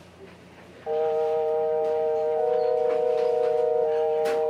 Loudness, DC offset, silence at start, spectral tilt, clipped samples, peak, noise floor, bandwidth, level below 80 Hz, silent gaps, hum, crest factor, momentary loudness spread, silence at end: -24 LUFS; under 0.1%; 0.2 s; -5 dB/octave; under 0.1%; -14 dBFS; -47 dBFS; 10.5 kHz; -68 dBFS; none; none; 10 dB; 2 LU; 0 s